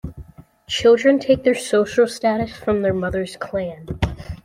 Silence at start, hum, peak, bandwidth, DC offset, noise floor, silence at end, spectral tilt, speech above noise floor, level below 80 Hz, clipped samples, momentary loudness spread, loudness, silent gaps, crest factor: 0.05 s; none; -2 dBFS; 15 kHz; under 0.1%; -43 dBFS; 0.1 s; -5.5 dB/octave; 24 dB; -40 dBFS; under 0.1%; 11 LU; -19 LUFS; none; 16 dB